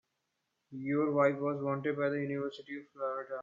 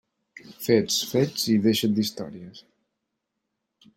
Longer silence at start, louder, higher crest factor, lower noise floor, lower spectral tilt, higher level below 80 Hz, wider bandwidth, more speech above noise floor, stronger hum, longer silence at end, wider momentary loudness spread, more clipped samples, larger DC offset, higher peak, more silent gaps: first, 0.7 s vs 0.45 s; second, -34 LUFS vs -23 LUFS; about the same, 20 dB vs 20 dB; about the same, -83 dBFS vs -81 dBFS; first, -8.5 dB/octave vs -4.5 dB/octave; second, -82 dBFS vs -66 dBFS; second, 7.2 kHz vs 16.5 kHz; second, 50 dB vs 57 dB; neither; second, 0 s vs 1.35 s; second, 14 LU vs 17 LU; neither; neither; second, -14 dBFS vs -6 dBFS; neither